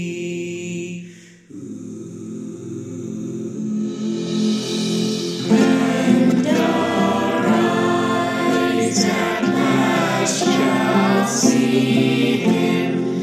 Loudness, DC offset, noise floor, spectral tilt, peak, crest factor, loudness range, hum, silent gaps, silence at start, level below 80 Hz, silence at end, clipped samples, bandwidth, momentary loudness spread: -18 LUFS; under 0.1%; -41 dBFS; -5 dB/octave; -2 dBFS; 16 dB; 12 LU; none; none; 0 s; -66 dBFS; 0 s; under 0.1%; 14.5 kHz; 15 LU